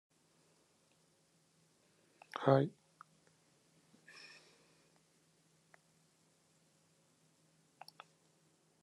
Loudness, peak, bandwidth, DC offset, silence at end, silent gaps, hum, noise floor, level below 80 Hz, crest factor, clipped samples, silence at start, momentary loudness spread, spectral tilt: -35 LUFS; -16 dBFS; 12 kHz; under 0.1%; 6.15 s; none; none; -74 dBFS; -86 dBFS; 30 dB; under 0.1%; 2.35 s; 28 LU; -7.5 dB/octave